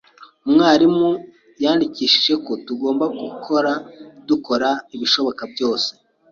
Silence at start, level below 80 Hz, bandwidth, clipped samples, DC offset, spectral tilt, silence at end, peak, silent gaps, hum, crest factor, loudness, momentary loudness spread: 0.2 s; -62 dBFS; 7.4 kHz; under 0.1%; under 0.1%; -4.5 dB/octave; 0.4 s; -2 dBFS; none; none; 18 dB; -18 LUFS; 12 LU